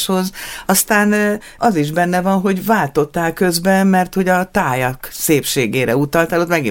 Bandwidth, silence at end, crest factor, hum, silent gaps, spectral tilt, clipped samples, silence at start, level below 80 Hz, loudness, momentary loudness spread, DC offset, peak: 17 kHz; 0 s; 14 dB; none; none; -4.5 dB/octave; under 0.1%; 0 s; -44 dBFS; -16 LUFS; 6 LU; under 0.1%; 0 dBFS